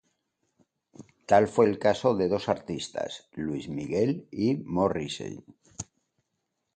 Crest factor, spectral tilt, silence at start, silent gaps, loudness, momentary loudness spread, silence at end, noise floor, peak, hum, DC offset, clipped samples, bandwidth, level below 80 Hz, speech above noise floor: 22 dB; -6 dB/octave; 1 s; none; -27 LUFS; 19 LU; 0.95 s; -81 dBFS; -8 dBFS; none; under 0.1%; under 0.1%; 9.2 kHz; -58 dBFS; 54 dB